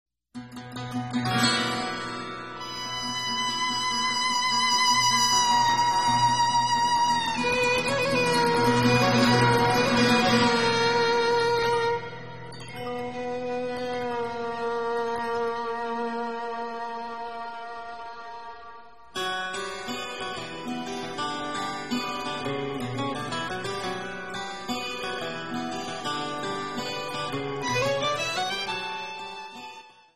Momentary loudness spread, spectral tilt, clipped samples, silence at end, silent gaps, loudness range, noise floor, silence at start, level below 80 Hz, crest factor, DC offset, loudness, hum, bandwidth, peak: 16 LU; -3.5 dB/octave; under 0.1%; 0 s; none; 12 LU; -47 dBFS; 0.05 s; -56 dBFS; 18 dB; 0.4%; -26 LUFS; none; 15 kHz; -8 dBFS